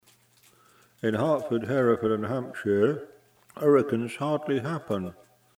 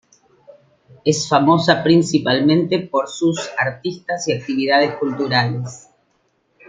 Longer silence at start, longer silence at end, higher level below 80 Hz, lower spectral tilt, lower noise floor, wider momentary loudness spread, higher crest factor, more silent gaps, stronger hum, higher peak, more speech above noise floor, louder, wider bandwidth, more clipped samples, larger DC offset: about the same, 1.05 s vs 1.05 s; second, 0.45 s vs 0.9 s; second, -68 dBFS vs -60 dBFS; first, -7.5 dB/octave vs -5 dB/octave; about the same, -61 dBFS vs -64 dBFS; about the same, 9 LU vs 9 LU; about the same, 18 dB vs 18 dB; neither; neither; second, -10 dBFS vs -2 dBFS; second, 35 dB vs 47 dB; second, -27 LUFS vs -18 LUFS; first, 15 kHz vs 9.4 kHz; neither; neither